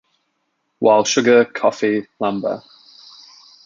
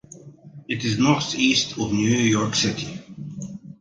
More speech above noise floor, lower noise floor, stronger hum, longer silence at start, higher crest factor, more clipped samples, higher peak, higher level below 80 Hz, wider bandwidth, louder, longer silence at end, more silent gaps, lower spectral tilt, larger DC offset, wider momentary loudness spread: first, 54 dB vs 23 dB; first, -70 dBFS vs -44 dBFS; neither; first, 0.8 s vs 0.1 s; about the same, 18 dB vs 20 dB; neither; about the same, -2 dBFS vs -2 dBFS; second, -66 dBFS vs -54 dBFS; second, 7.6 kHz vs 9.6 kHz; first, -17 LUFS vs -21 LUFS; first, 1.05 s vs 0.05 s; neither; about the same, -3.5 dB/octave vs -4 dB/octave; neither; second, 11 LU vs 17 LU